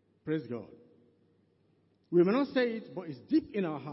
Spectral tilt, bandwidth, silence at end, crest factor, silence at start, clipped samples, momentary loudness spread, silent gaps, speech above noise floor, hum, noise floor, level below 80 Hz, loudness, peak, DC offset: -10.5 dB/octave; 5.8 kHz; 0 s; 20 dB; 0.25 s; under 0.1%; 16 LU; none; 39 dB; none; -70 dBFS; -74 dBFS; -31 LUFS; -14 dBFS; under 0.1%